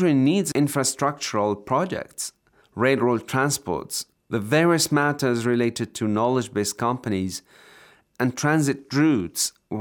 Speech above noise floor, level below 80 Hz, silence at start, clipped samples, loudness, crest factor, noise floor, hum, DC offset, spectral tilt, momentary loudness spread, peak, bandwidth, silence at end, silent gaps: 30 dB; -64 dBFS; 0 s; under 0.1%; -23 LUFS; 16 dB; -53 dBFS; none; under 0.1%; -4.5 dB/octave; 10 LU; -6 dBFS; over 20 kHz; 0 s; none